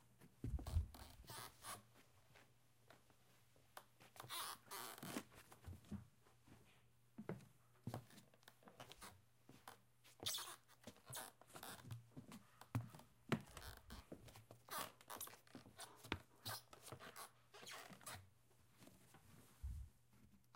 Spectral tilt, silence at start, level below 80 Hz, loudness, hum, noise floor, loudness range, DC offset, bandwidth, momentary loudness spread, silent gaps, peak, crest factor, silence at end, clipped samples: -3.5 dB/octave; 0 s; -62 dBFS; -54 LUFS; none; -75 dBFS; 7 LU; under 0.1%; 16.5 kHz; 18 LU; none; -24 dBFS; 32 dB; 0 s; under 0.1%